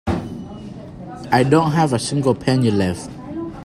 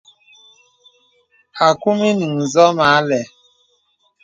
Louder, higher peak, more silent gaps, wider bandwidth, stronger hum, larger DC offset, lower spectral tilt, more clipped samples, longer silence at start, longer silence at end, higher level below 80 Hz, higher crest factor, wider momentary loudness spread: second, -18 LUFS vs -15 LUFS; about the same, 0 dBFS vs 0 dBFS; neither; first, 14 kHz vs 9 kHz; neither; neither; about the same, -6 dB/octave vs -5 dB/octave; neither; second, 0.05 s vs 1.55 s; second, 0 s vs 1 s; first, -44 dBFS vs -62 dBFS; about the same, 18 dB vs 18 dB; first, 19 LU vs 10 LU